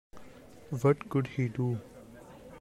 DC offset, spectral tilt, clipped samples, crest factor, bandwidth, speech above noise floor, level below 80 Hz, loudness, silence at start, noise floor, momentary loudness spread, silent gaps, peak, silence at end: under 0.1%; -8.5 dB/octave; under 0.1%; 18 dB; 13 kHz; 21 dB; -62 dBFS; -31 LUFS; 0.15 s; -51 dBFS; 23 LU; none; -14 dBFS; 0 s